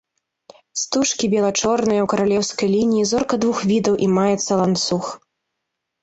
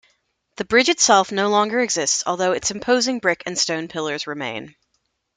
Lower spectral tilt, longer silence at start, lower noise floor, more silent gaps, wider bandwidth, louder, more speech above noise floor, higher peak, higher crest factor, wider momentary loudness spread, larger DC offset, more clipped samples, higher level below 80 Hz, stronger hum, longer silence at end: first, -4.5 dB/octave vs -2 dB/octave; first, 0.75 s vs 0.6 s; first, -79 dBFS vs -71 dBFS; neither; second, 8.2 kHz vs 11 kHz; about the same, -19 LUFS vs -19 LUFS; first, 60 dB vs 51 dB; second, -6 dBFS vs -2 dBFS; second, 14 dB vs 20 dB; second, 5 LU vs 12 LU; neither; neither; first, -54 dBFS vs -60 dBFS; neither; first, 0.85 s vs 0.65 s